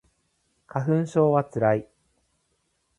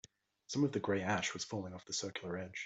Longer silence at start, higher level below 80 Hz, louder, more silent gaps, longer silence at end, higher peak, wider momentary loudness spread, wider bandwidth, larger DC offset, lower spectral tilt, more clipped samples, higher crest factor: first, 0.75 s vs 0.5 s; first, -64 dBFS vs -76 dBFS; first, -24 LUFS vs -38 LUFS; neither; first, 1.15 s vs 0 s; first, -6 dBFS vs -22 dBFS; about the same, 8 LU vs 8 LU; first, 10.5 kHz vs 8.2 kHz; neither; first, -9 dB/octave vs -4 dB/octave; neither; about the same, 20 dB vs 18 dB